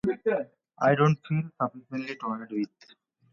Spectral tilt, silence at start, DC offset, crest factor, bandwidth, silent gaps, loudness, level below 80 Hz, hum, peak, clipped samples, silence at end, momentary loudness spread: -8 dB/octave; 0.05 s; under 0.1%; 20 dB; 6.8 kHz; none; -28 LUFS; -66 dBFS; none; -8 dBFS; under 0.1%; 0.65 s; 13 LU